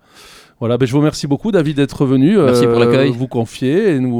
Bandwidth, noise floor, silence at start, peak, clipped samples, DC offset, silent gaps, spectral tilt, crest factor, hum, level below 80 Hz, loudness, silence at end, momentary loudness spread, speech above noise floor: 15.5 kHz; -42 dBFS; 0.6 s; -2 dBFS; under 0.1%; under 0.1%; none; -7 dB/octave; 12 dB; none; -46 dBFS; -14 LUFS; 0 s; 8 LU; 29 dB